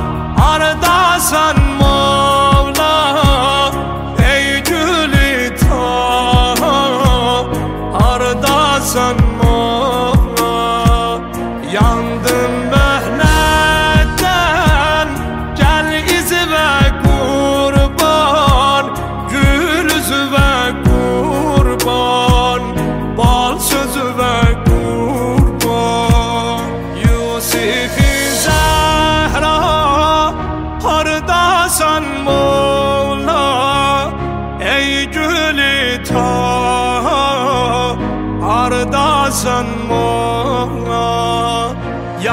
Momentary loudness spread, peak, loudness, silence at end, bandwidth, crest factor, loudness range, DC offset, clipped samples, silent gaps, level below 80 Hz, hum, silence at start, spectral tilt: 6 LU; 0 dBFS; -13 LUFS; 0 s; 16.5 kHz; 12 dB; 2 LU; 0.1%; under 0.1%; none; -20 dBFS; none; 0 s; -4.5 dB/octave